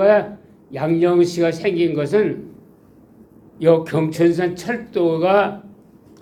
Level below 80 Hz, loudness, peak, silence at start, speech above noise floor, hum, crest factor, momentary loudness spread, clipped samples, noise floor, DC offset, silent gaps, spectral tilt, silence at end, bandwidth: -60 dBFS; -18 LUFS; -2 dBFS; 0 s; 31 dB; none; 16 dB; 10 LU; under 0.1%; -48 dBFS; under 0.1%; none; -7 dB/octave; 0.5 s; 13 kHz